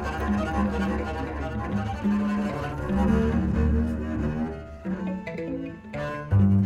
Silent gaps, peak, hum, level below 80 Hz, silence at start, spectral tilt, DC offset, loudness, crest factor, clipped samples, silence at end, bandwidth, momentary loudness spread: none; -10 dBFS; none; -34 dBFS; 0 s; -8.5 dB/octave; under 0.1%; -27 LUFS; 14 dB; under 0.1%; 0 s; 11.5 kHz; 10 LU